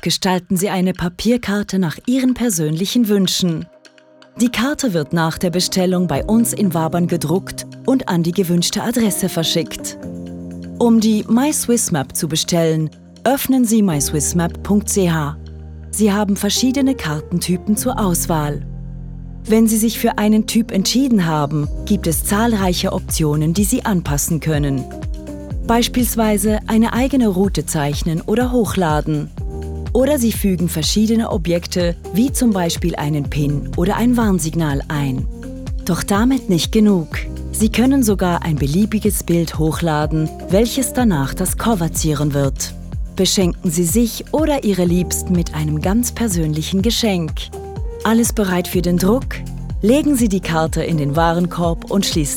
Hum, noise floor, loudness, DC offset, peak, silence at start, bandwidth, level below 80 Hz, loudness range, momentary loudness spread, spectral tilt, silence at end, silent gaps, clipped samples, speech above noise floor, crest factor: none; -46 dBFS; -17 LUFS; under 0.1%; -2 dBFS; 0.05 s; 19 kHz; -30 dBFS; 2 LU; 10 LU; -5 dB/octave; 0 s; none; under 0.1%; 30 dB; 16 dB